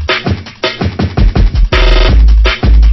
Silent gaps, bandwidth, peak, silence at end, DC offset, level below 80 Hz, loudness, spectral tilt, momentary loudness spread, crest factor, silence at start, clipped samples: none; 6 kHz; 0 dBFS; 0 s; under 0.1%; -8 dBFS; -11 LUFS; -6.5 dB/octave; 7 LU; 8 dB; 0 s; 0.2%